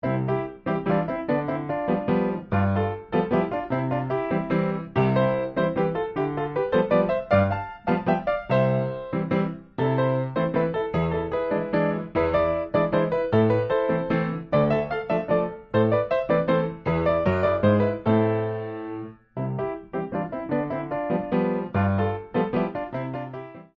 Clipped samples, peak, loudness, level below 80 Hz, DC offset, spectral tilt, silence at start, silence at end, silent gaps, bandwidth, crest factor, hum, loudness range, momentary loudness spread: under 0.1%; -6 dBFS; -25 LUFS; -52 dBFS; under 0.1%; -7 dB/octave; 0.05 s; 0.15 s; none; 5.8 kHz; 18 dB; none; 3 LU; 8 LU